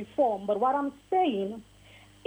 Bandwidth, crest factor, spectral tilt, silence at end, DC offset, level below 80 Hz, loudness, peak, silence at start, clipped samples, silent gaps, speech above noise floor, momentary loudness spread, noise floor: over 20 kHz; 14 dB; -6.5 dB/octave; 0.65 s; under 0.1%; -64 dBFS; -28 LUFS; -14 dBFS; 0 s; under 0.1%; none; 26 dB; 9 LU; -54 dBFS